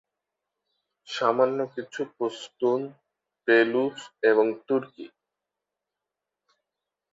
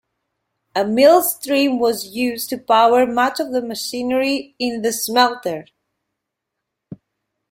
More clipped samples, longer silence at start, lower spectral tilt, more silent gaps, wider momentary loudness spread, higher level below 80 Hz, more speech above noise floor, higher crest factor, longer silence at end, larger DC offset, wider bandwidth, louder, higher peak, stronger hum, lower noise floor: neither; first, 1.1 s vs 0.75 s; first, -5 dB/octave vs -3 dB/octave; neither; first, 15 LU vs 12 LU; second, -78 dBFS vs -62 dBFS; about the same, 62 dB vs 63 dB; about the same, 20 dB vs 18 dB; first, 2.05 s vs 0.55 s; neither; second, 7.8 kHz vs 16.5 kHz; second, -25 LUFS vs -18 LUFS; second, -8 dBFS vs -2 dBFS; first, 50 Hz at -75 dBFS vs none; first, -87 dBFS vs -80 dBFS